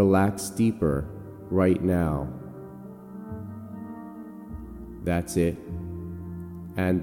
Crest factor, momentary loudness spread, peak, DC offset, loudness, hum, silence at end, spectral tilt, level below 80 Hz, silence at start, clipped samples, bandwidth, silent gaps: 18 dB; 18 LU; -10 dBFS; under 0.1%; -27 LUFS; none; 0 s; -7 dB/octave; -44 dBFS; 0 s; under 0.1%; 17 kHz; none